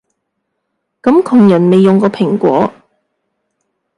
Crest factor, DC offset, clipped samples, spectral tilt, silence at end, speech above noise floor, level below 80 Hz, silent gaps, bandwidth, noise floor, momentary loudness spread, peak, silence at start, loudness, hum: 12 dB; under 0.1%; under 0.1%; -8.5 dB/octave; 1.25 s; 62 dB; -56 dBFS; none; 11 kHz; -70 dBFS; 7 LU; 0 dBFS; 1.05 s; -10 LUFS; none